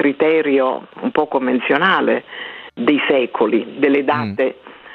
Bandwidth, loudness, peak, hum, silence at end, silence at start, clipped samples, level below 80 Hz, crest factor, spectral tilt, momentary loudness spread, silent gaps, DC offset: 5.2 kHz; -17 LUFS; -2 dBFS; none; 0 s; 0 s; under 0.1%; -64 dBFS; 16 dB; -8 dB/octave; 8 LU; none; under 0.1%